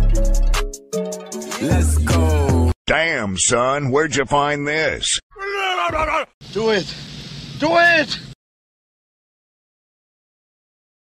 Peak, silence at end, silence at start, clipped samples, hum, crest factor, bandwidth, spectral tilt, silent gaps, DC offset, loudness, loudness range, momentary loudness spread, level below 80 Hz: -4 dBFS; 2.8 s; 0 s; under 0.1%; none; 16 dB; 15 kHz; -4 dB/octave; 2.76-2.85 s, 5.23-5.30 s, 6.34-6.41 s; under 0.1%; -18 LUFS; 4 LU; 12 LU; -26 dBFS